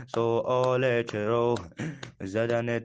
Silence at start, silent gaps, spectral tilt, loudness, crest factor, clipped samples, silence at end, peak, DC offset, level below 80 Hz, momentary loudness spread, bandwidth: 0 s; none; -6.5 dB/octave; -28 LUFS; 14 dB; under 0.1%; 0 s; -12 dBFS; under 0.1%; -64 dBFS; 12 LU; 9 kHz